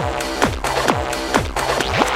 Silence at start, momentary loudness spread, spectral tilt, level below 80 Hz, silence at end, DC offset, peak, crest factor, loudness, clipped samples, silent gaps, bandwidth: 0 s; 3 LU; -4 dB/octave; -32 dBFS; 0 s; under 0.1%; 0 dBFS; 18 dB; -19 LUFS; under 0.1%; none; 16 kHz